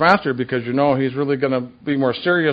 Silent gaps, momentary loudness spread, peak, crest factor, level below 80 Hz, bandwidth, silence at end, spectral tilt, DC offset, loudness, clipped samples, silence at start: none; 5 LU; 0 dBFS; 18 dB; -56 dBFS; 8 kHz; 0 s; -8 dB/octave; under 0.1%; -19 LUFS; under 0.1%; 0 s